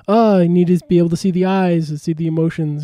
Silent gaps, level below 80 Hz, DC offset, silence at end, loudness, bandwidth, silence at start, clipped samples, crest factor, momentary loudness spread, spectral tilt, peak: none; -52 dBFS; under 0.1%; 0 s; -16 LUFS; 11 kHz; 0.1 s; under 0.1%; 12 dB; 7 LU; -8 dB/octave; -4 dBFS